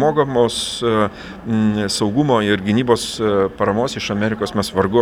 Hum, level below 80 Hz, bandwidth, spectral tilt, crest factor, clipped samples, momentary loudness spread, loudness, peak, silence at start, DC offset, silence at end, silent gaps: none; -46 dBFS; 15.5 kHz; -5 dB/octave; 16 dB; under 0.1%; 4 LU; -18 LUFS; -2 dBFS; 0 s; under 0.1%; 0 s; none